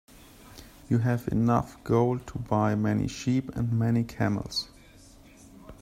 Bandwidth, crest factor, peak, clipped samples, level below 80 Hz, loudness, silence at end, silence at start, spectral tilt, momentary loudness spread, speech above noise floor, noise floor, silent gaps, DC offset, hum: 15 kHz; 18 dB; -10 dBFS; under 0.1%; -50 dBFS; -27 LUFS; 0.1 s; 0.45 s; -7 dB/octave; 8 LU; 26 dB; -52 dBFS; none; under 0.1%; none